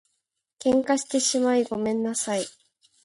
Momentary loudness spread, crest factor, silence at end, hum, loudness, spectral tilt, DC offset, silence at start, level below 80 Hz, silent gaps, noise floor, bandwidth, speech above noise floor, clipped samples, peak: 7 LU; 16 dB; 0.55 s; none; -24 LUFS; -3 dB/octave; under 0.1%; 0.6 s; -66 dBFS; none; -78 dBFS; 11.5 kHz; 54 dB; under 0.1%; -8 dBFS